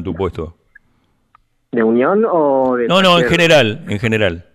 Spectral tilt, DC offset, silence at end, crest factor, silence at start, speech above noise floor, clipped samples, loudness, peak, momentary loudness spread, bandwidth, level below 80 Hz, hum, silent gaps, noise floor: -5.5 dB/octave; under 0.1%; 0.15 s; 12 dB; 0 s; 45 dB; under 0.1%; -14 LUFS; -4 dBFS; 12 LU; 16 kHz; -42 dBFS; none; none; -59 dBFS